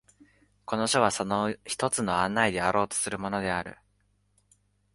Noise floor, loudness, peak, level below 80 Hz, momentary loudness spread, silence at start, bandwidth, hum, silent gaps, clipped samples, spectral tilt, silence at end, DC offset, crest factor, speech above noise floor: -70 dBFS; -27 LUFS; -8 dBFS; -58 dBFS; 8 LU; 0.7 s; 11.5 kHz; 50 Hz at -50 dBFS; none; under 0.1%; -3.5 dB/octave; 1.2 s; under 0.1%; 22 dB; 42 dB